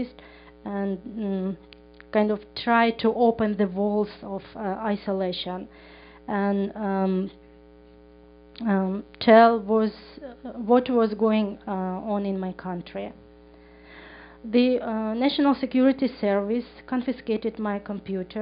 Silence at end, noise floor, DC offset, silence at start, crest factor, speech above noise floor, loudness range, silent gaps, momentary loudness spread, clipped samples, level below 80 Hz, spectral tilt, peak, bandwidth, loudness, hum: 0 s; -51 dBFS; under 0.1%; 0 s; 22 dB; 26 dB; 7 LU; none; 15 LU; under 0.1%; -56 dBFS; -5 dB/octave; -4 dBFS; 5.2 kHz; -24 LUFS; none